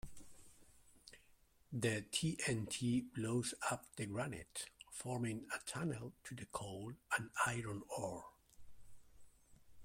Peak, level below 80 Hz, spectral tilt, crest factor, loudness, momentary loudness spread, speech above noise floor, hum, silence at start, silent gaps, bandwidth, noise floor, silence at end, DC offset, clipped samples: -24 dBFS; -68 dBFS; -4 dB/octave; 22 dB; -42 LUFS; 17 LU; 28 dB; none; 0.05 s; none; 16.5 kHz; -70 dBFS; 0 s; under 0.1%; under 0.1%